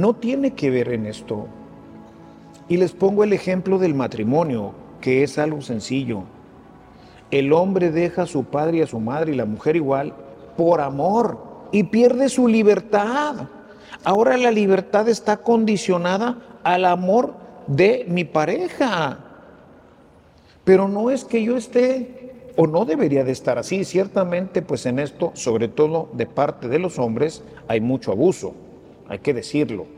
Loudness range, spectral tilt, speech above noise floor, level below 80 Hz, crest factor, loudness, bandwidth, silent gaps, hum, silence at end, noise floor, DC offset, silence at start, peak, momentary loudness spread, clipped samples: 4 LU; -6.5 dB/octave; 31 dB; -58 dBFS; 18 dB; -20 LUFS; 11.5 kHz; none; none; 0 s; -51 dBFS; under 0.1%; 0 s; -2 dBFS; 11 LU; under 0.1%